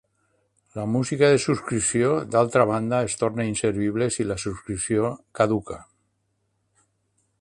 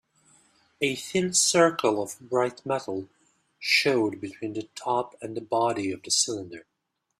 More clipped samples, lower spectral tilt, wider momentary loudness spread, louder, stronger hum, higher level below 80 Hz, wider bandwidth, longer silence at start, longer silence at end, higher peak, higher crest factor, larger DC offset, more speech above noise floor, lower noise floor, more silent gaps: neither; first, -5 dB/octave vs -2.5 dB/octave; second, 10 LU vs 14 LU; first, -23 LUFS vs -26 LUFS; neither; first, -52 dBFS vs -70 dBFS; second, 11.5 kHz vs 15 kHz; about the same, 0.75 s vs 0.8 s; first, 1.6 s vs 0.6 s; about the same, -4 dBFS vs -6 dBFS; about the same, 20 dB vs 20 dB; neither; second, 49 dB vs 53 dB; second, -72 dBFS vs -80 dBFS; neither